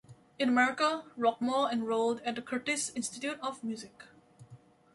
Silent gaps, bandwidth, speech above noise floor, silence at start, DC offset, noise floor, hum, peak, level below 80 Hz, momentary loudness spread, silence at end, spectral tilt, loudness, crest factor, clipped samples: none; 11.5 kHz; 25 dB; 0.1 s; under 0.1%; -57 dBFS; none; -14 dBFS; -76 dBFS; 11 LU; 0.4 s; -3 dB/octave; -31 LUFS; 18 dB; under 0.1%